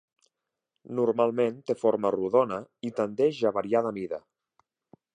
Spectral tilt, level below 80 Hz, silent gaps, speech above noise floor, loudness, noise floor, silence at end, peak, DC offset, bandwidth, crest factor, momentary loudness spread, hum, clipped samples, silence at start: -7 dB/octave; -72 dBFS; none; 57 dB; -27 LUFS; -84 dBFS; 1 s; -10 dBFS; under 0.1%; 9.8 kHz; 18 dB; 10 LU; none; under 0.1%; 0.85 s